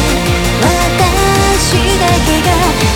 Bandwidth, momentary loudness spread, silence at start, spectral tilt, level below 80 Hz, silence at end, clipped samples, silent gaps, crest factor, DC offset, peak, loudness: 19 kHz; 2 LU; 0 s; -4 dB/octave; -18 dBFS; 0 s; under 0.1%; none; 10 dB; 0.7%; 0 dBFS; -11 LUFS